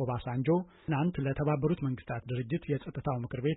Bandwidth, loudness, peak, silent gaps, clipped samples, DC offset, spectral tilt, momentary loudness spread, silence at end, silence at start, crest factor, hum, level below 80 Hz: 4 kHz; -33 LUFS; -18 dBFS; none; under 0.1%; under 0.1%; -12 dB/octave; 6 LU; 0 s; 0 s; 14 dB; none; -54 dBFS